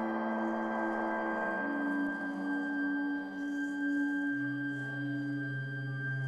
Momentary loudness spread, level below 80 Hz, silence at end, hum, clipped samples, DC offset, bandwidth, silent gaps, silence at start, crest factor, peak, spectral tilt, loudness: 4 LU; -74 dBFS; 0 s; none; under 0.1%; under 0.1%; 8.4 kHz; none; 0 s; 12 dB; -22 dBFS; -7.5 dB/octave; -35 LUFS